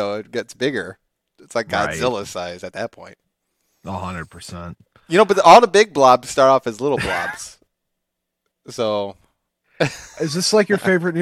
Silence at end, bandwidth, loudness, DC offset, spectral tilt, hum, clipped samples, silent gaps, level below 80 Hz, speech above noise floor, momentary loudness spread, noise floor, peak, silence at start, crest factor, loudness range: 0 s; 15 kHz; -17 LUFS; under 0.1%; -4 dB/octave; none; 0.1%; none; -54 dBFS; 61 dB; 21 LU; -78 dBFS; 0 dBFS; 0 s; 20 dB; 12 LU